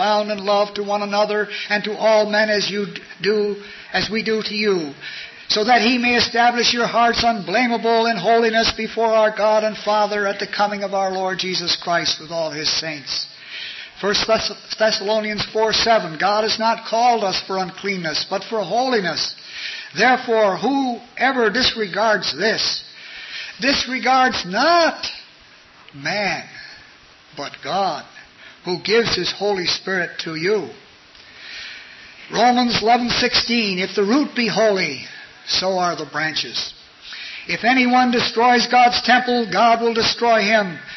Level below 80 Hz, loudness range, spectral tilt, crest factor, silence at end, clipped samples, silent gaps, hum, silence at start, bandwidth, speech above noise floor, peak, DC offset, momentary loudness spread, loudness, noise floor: -52 dBFS; 5 LU; -3.5 dB/octave; 16 dB; 0 s; under 0.1%; none; none; 0 s; 6.2 kHz; 29 dB; -4 dBFS; under 0.1%; 14 LU; -18 LUFS; -47 dBFS